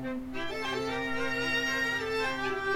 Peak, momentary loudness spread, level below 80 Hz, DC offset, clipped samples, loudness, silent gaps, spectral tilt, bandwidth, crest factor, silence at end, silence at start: -18 dBFS; 7 LU; -54 dBFS; under 0.1%; under 0.1%; -31 LUFS; none; -3.5 dB/octave; 17 kHz; 14 dB; 0 s; 0 s